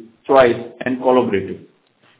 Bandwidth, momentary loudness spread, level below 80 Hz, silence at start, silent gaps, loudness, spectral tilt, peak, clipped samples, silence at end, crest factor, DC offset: 4 kHz; 14 LU; -52 dBFS; 0 s; none; -16 LUFS; -10 dB/octave; 0 dBFS; under 0.1%; 0.65 s; 18 dB; under 0.1%